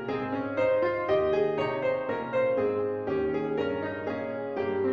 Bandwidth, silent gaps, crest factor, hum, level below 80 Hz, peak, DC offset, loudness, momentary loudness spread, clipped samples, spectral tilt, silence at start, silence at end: 6.4 kHz; none; 14 dB; none; -60 dBFS; -14 dBFS; under 0.1%; -28 LUFS; 7 LU; under 0.1%; -8 dB/octave; 0 s; 0 s